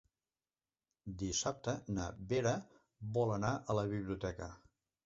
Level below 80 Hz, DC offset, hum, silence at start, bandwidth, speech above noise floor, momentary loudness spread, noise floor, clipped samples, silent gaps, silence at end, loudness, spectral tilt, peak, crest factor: -58 dBFS; under 0.1%; none; 1.05 s; 7.6 kHz; over 52 dB; 14 LU; under -90 dBFS; under 0.1%; none; 0.5 s; -38 LUFS; -5.5 dB/octave; -20 dBFS; 20 dB